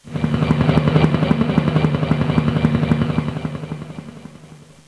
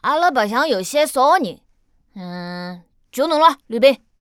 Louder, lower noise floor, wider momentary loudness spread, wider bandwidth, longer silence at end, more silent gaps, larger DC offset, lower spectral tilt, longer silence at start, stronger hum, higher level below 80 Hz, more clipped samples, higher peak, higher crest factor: about the same, -18 LUFS vs -17 LUFS; second, -43 dBFS vs -59 dBFS; about the same, 15 LU vs 17 LU; second, 11 kHz vs 17 kHz; about the same, 0.3 s vs 0.25 s; neither; first, 0.1% vs under 0.1%; first, -8.5 dB/octave vs -3.5 dB/octave; about the same, 0.05 s vs 0.05 s; neither; first, -36 dBFS vs -62 dBFS; neither; about the same, 0 dBFS vs -2 dBFS; about the same, 18 dB vs 18 dB